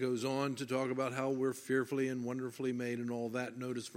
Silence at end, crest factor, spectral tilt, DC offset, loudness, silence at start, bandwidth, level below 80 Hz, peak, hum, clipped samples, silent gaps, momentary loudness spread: 0 s; 16 dB; -5.5 dB/octave; under 0.1%; -37 LUFS; 0 s; 16 kHz; -84 dBFS; -20 dBFS; none; under 0.1%; none; 5 LU